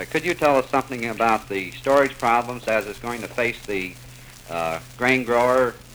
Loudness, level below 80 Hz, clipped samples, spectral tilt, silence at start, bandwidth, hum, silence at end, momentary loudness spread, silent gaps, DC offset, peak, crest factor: -22 LUFS; -50 dBFS; under 0.1%; -4.5 dB/octave; 0 s; over 20 kHz; none; 0 s; 11 LU; none; under 0.1%; -4 dBFS; 18 dB